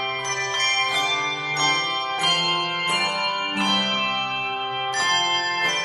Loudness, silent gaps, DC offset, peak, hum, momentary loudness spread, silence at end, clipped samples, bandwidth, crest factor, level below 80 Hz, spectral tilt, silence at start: -21 LUFS; none; under 0.1%; -8 dBFS; none; 5 LU; 0 s; under 0.1%; 15.5 kHz; 16 dB; -68 dBFS; -1.5 dB/octave; 0 s